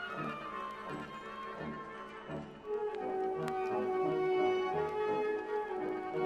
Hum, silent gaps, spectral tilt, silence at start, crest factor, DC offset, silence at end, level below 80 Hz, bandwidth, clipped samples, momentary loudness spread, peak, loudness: none; none; -6.5 dB/octave; 0 s; 20 dB; under 0.1%; 0 s; -68 dBFS; 9.4 kHz; under 0.1%; 12 LU; -18 dBFS; -37 LUFS